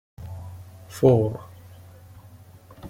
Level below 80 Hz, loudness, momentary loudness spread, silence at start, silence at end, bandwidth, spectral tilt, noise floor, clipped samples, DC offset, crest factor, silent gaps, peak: -54 dBFS; -21 LUFS; 24 LU; 0.2 s; 0 s; 16 kHz; -8.5 dB/octave; -48 dBFS; under 0.1%; under 0.1%; 22 dB; none; -4 dBFS